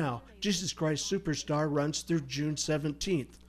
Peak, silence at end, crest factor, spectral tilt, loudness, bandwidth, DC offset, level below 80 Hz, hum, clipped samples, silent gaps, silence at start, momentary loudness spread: -18 dBFS; 0.1 s; 14 dB; -4.5 dB/octave; -32 LUFS; 15 kHz; under 0.1%; -54 dBFS; none; under 0.1%; none; 0 s; 3 LU